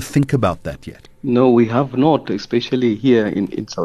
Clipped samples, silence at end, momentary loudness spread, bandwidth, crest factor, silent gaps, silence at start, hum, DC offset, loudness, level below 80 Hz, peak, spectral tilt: under 0.1%; 0 s; 13 LU; 13 kHz; 14 dB; none; 0 s; none; under 0.1%; -17 LUFS; -46 dBFS; -2 dBFS; -7 dB/octave